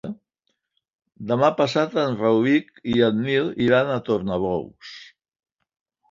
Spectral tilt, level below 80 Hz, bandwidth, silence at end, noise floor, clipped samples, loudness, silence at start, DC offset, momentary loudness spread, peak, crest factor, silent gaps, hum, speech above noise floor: -7 dB/octave; -56 dBFS; 7.6 kHz; 1.05 s; -76 dBFS; under 0.1%; -21 LUFS; 0.05 s; under 0.1%; 19 LU; -4 dBFS; 18 dB; 0.95-0.99 s; none; 55 dB